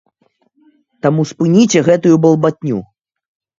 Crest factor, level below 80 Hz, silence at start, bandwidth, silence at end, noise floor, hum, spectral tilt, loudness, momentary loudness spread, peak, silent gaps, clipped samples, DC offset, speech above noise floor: 14 dB; -56 dBFS; 1.05 s; 7.8 kHz; 0.75 s; -60 dBFS; none; -6.5 dB/octave; -13 LUFS; 11 LU; 0 dBFS; none; under 0.1%; under 0.1%; 49 dB